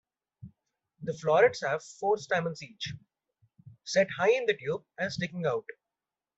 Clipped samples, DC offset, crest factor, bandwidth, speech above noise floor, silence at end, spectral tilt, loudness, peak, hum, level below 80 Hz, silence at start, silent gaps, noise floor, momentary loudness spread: under 0.1%; under 0.1%; 20 dB; 8 kHz; over 61 dB; 0.65 s; -4.5 dB/octave; -29 LUFS; -10 dBFS; none; -70 dBFS; 0.45 s; none; under -90 dBFS; 15 LU